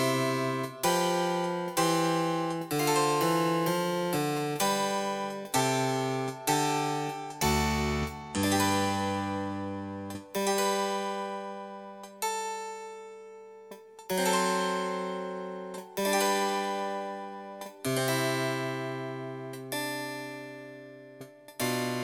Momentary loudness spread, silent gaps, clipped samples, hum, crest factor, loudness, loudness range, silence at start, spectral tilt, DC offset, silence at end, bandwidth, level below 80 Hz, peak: 16 LU; none; under 0.1%; none; 18 dB; -30 LUFS; 6 LU; 0 s; -4 dB/octave; under 0.1%; 0 s; 19 kHz; -52 dBFS; -14 dBFS